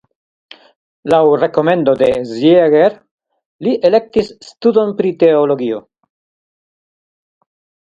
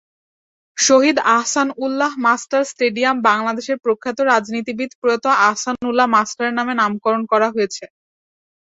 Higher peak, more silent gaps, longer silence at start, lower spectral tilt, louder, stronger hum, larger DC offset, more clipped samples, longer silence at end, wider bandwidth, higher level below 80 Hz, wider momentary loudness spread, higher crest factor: about the same, 0 dBFS vs -2 dBFS; first, 3.11-3.18 s, 3.46-3.59 s vs 4.95-5.02 s; first, 1.05 s vs 0.75 s; first, -7 dB/octave vs -2.5 dB/octave; first, -13 LUFS vs -17 LUFS; neither; neither; neither; first, 2.15 s vs 0.8 s; about the same, 8 kHz vs 8.4 kHz; first, -54 dBFS vs -64 dBFS; about the same, 9 LU vs 8 LU; about the same, 14 dB vs 16 dB